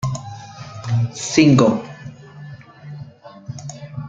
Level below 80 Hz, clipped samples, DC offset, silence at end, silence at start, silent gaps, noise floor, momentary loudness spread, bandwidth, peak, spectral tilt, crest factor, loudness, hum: -52 dBFS; under 0.1%; under 0.1%; 0 s; 0 s; none; -39 dBFS; 26 LU; 9.2 kHz; 0 dBFS; -6 dB/octave; 20 dB; -17 LUFS; none